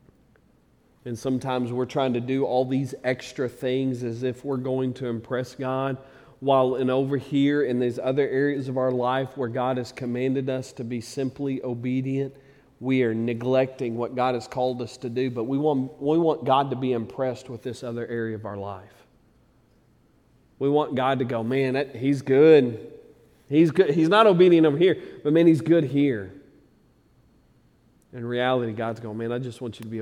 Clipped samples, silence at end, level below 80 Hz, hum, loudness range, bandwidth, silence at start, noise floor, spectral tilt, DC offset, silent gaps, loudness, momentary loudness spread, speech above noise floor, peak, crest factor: under 0.1%; 0 s; -64 dBFS; none; 10 LU; 12 kHz; 1.05 s; -61 dBFS; -7.5 dB/octave; under 0.1%; none; -24 LUFS; 14 LU; 37 dB; -4 dBFS; 20 dB